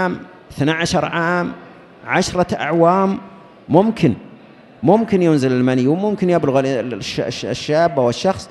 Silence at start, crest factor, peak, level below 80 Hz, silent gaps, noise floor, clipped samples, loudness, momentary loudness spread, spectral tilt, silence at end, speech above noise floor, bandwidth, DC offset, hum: 0 s; 16 dB; 0 dBFS; -48 dBFS; none; -43 dBFS; under 0.1%; -17 LUFS; 9 LU; -6 dB/octave; 0 s; 26 dB; 12 kHz; under 0.1%; none